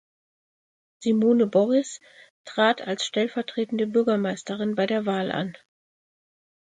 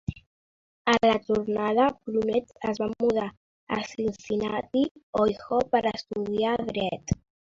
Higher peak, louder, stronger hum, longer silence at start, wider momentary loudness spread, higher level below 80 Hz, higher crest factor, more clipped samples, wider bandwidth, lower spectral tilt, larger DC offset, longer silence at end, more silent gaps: about the same, -8 dBFS vs -8 dBFS; first, -24 LUFS vs -27 LUFS; neither; first, 1 s vs 0.1 s; about the same, 10 LU vs 9 LU; second, -74 dBFS vs -52 dBFS; about the same, 16 dB vs 20 dB; neither; first, 9.4 kHz vs 7.6 kHz; about the same, -5 dB/octave vs -5.5 dB/octave; neither; first, 1.1 s vs 0.4 s; second, 2.30-2.45 s vs 0.26-0.85 s, 3.37-3.67 s, 4.91-4.95 s, 5.03-5.13 s